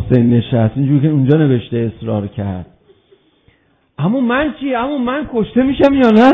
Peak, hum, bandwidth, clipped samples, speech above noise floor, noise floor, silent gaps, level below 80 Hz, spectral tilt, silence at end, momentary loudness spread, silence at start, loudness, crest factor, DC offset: 0 dBFS; none; 6.6 kHz; 0.3%; 42 dB; -54 dBFS; none; -40 dBFS; -9.5 dB/octave; 0 s; 9 LU; 0 s; -14 LUFS; 14 dB; under 0.1%